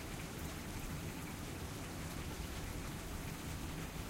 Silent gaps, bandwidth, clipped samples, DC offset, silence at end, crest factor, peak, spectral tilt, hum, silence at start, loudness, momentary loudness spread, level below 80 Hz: none; 16 kHz; under 0.1%; under 0.1%; 0 s; 14 dB; -32 dBFS; -4.5 dB/octave; none; 0 s; -45 LUFS; 1 LU; -50 dBFS